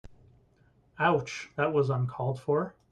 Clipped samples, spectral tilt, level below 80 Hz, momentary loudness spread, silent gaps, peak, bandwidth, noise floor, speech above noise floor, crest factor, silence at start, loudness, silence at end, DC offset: under 0.1%; -6.5 dB/octave; -64 dBFS; 5 LU; none; -12 dBFS; 9.2 kHz; -64 dBFS; 36 dB; 18 dB; 0.05 s; -29 LUFS; 0.2 s; under 0.1%